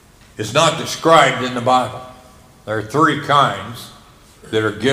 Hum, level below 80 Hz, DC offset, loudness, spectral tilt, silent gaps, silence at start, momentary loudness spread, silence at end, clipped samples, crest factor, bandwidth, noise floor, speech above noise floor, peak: none; -52 dBFS; under 0.1%; -16 LUFS; -4 dB/octave; none; 0.4 s; 18 LU; 0 s; under 0.1%; 18 dB; 16 kHz; -45 dBFS; 29 dB; 0 dBFS